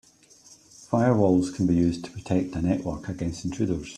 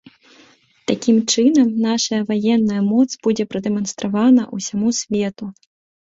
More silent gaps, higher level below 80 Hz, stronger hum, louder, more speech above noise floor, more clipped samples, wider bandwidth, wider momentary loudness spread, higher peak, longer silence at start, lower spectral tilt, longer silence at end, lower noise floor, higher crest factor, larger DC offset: neither; first, -50 dBFS vs -60 dBFS; neither; second, -25 LUFS vs -18 LUFS; second, 30 dB vs 35 dB; neither; first, 10.5 kHz vs 8 kHz; about the same, 10 LU vs 10 LU; second, -8 dBFS vs -2 dBFS; second, 0.5 s vs 0.9 s; first, -7.5 dB/octave vs -4.5 dB/octave; second, 0 s vs 0.5 s; about the same, -54 dBFS vs -52 dBFS; about the same, 18 dB vs 16 dB; neither